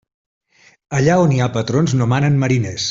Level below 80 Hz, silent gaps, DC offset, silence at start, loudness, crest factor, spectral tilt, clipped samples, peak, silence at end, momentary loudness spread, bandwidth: -48 dBFS; none; under 0.1%; 0.9 s; -16 LUFS; 14 dB; -6 dB/octave; under 0.1%; -2 dBFS; 0 s; 4 LU; 7.8 kHz